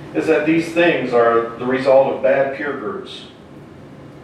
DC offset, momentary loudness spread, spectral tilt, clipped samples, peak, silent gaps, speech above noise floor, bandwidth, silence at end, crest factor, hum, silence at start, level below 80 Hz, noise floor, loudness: under 0.1%; 13 LU; -6 dB/octave; under 0.1%; -2 dBFS; none; 22 dB; 11.5 kHz; 0 s; 16 dB; none; 0 s; -56 dBFS; -39 dBFS; -17 LUFS